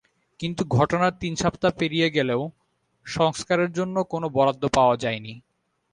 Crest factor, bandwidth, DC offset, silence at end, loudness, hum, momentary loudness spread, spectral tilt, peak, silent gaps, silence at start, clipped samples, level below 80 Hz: 20 dB; 11 kHz; under 0.1%; 0.55 s; -23 LUFS; none; 11 LU; -5.5 dB/octave; -6 dBFS; none; 0.4 s; under 0.1%; -52 dBFS